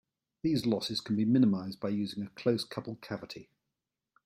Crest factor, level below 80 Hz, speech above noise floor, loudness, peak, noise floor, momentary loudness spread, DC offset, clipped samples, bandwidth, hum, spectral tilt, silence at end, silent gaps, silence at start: 18 dB; -70 dBFS; 57 dB; -32 LUFS; -14 dBFS; -88 dBFS; 14 LU; under 0.1%; under 0.1%; 16 kHz; none; -6.5 dB/octave; 0.85 s; none; 0.45 s